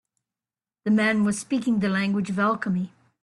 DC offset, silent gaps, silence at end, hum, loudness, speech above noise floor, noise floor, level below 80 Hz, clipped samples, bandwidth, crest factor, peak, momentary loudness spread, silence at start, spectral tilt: under 0.1%; none; 0.35 s; none; -24 LUFS; over 67 dB; under -90 dBFS; -64 dBFS; under 0.1%; 11.5 kHz; 16 dB; -10 dBFS; 8 LU; 0.85 s; -5.5 dB/octave